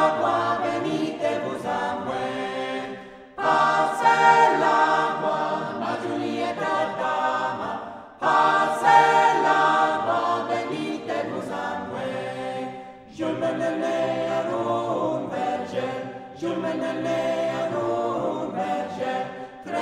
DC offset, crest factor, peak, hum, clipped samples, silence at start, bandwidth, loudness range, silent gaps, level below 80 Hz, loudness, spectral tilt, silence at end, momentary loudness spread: under 0.1%; 20 dB; -4 dBFS; none; under 0.1%; 0 s; 13 kHz; 7 LU; none; -66 dBFS; -23 LUFS; -5 dB/octave; 0 s; 12 LU